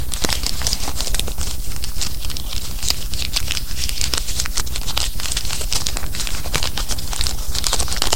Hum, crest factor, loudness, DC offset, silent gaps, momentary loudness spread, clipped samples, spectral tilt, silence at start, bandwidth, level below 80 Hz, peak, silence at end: none; 22 dB; -22 LUFS; 10%; none; 6 LU; under 0.1%; -1.5 dB/octave; 0 s; 17 kHz; -26 dBFS; 0 dBFS; 0 s